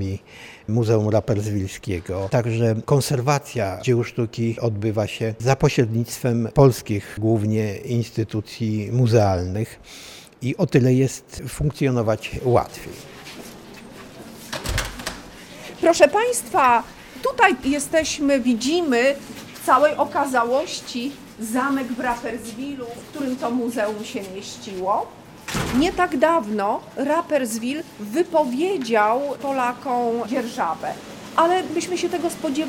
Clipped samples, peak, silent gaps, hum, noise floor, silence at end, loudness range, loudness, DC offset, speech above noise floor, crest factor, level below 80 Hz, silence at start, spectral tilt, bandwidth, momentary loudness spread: under 0.1%; 0 dBFS; none; none; -40 dBFS; 0 s; 6 LU; -22 LUFS; under 0.1%; 19 dB; 22 dB; -46 dBFS; 0 s; -5.5 dB/octave; 17.5 kHz; 16 LU